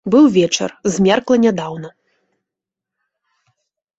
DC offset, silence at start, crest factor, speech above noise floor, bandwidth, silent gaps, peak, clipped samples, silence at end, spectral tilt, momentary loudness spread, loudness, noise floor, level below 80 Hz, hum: under 0.1%; 0.05 s; 16 dB; 70 dB; 8.2 kHz; none; -2 dBFS; under 0.1%; 2.1 s; -5 dB/octave; 17 LU; -15 LUFS; -84 dBFS; -56 dBFS; none